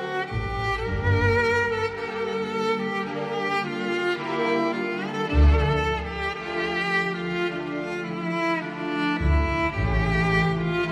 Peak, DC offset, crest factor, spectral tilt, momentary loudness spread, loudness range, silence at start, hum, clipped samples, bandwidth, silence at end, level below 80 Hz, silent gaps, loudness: -8 dBFS; under 0.1%; 18 dB; -6.5 dB/octave; 8 LU; 2 LU; 0 s; none; under 0.1%; 10 kHz; 0 s; -30 dBFS; none; -25 LUFS